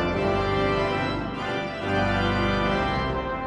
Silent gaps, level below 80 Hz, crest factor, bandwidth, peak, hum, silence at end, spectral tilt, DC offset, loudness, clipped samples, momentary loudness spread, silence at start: none; -38 dBFS; 14 dB; 10 kHz; -12 dBFS; 50 Hz at -40 dBFS; 0 s; -6.5 dB/octave; under 0.1%; -25 LUFS; under 0.1%; 5 LU; 0 s